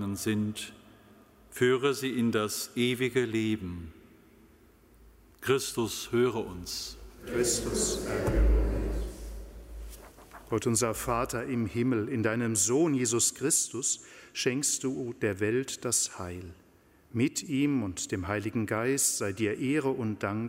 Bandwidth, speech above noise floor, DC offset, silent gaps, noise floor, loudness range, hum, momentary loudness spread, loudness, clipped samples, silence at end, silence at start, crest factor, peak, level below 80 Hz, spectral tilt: 16 kHz; 31 dB; under 0.1%; none; -61 dBFS; 5 LU; none; 15 LU; -29 LUFS; under 0.1%; 0 s; 0 s; 18 dB; -12 dBFS; -40 dBFS; -4 dB/octave